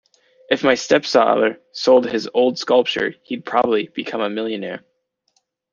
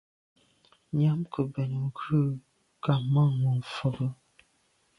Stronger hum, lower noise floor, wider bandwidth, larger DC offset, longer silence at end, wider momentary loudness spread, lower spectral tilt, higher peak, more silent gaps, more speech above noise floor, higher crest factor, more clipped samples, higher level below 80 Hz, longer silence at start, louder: neither; about the same, -68 dBFS vs -70 dBFS; second, 7.4 kHz vs 10 kHz; neither; about the same, 0.95 s vs 0.85 s; about the same, 10 LU vs 9 LU; second, -4 dB/octave vs -9 dB/octave; first, -2 dBFS vs -10 dBFS; neither; first, 49 dB vs 43 dB; about the same, 18 dB vs 20 dB; neither; about the same, -64 dBFS vs -64 dBFS; second, 0.5 s vs 0.95 s; first, -18 LUFS vs -29 LUFS